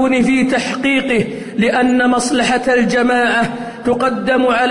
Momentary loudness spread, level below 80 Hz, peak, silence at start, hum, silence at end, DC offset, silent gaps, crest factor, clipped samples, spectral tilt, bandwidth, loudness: 5 LU; -46 dBFS; -4 dBFS; 0 s; none; 0 s; under 0.1%; none; 10 dB; under 0.1%; -4.5 dB/octave; 11 kHz; -14 LUFS